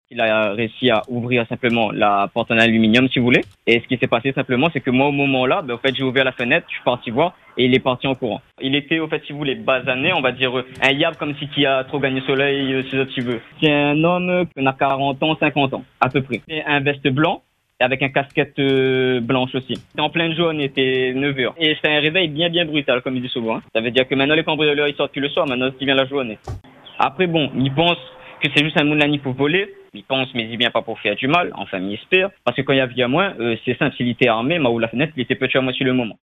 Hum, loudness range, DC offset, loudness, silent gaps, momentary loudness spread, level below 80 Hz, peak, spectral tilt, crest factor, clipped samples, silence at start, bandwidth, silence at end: none; 3 LU; under 0.1%; -18 LUFS; none; 6 LU; -54 dBFS; 0 dBFS; -6.5 dB/octave; 18 dB; under 0.1%; 0.1 s; 9.8 kHz; 0.1 s